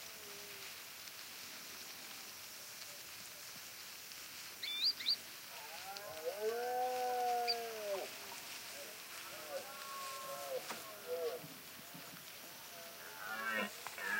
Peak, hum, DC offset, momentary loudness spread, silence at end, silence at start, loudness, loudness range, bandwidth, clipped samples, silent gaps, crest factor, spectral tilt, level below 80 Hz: -24 dBFS; none; under 0.1%; 12 LU; 0 s; 0 s; -43 LUFS; 9 LU; 16 kHz; under 0.1%; none; 20 dB; -0.5 dB/octave; -86 dBFS